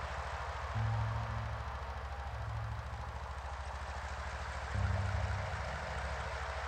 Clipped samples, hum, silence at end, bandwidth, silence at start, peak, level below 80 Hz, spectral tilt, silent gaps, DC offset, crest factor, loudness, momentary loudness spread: under 0.1%; none; 0 s; 9.4 kHz; 0 s; -24 dBFS; -44 dBFS; -5.5 dB/octave; none; under 0.1%; 16 dB; -40 LUFS; 7 LU